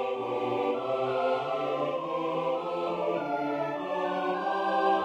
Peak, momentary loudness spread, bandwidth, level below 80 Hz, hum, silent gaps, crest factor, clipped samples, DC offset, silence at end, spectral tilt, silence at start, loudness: -14 dBFS; 3 LU; 8.8 kHz; -76 dBFS; none; none; 16 dB; under 0.1%; under 0.1%; 0 s; -6.5 dB/octave; 0 s; -30 LUFS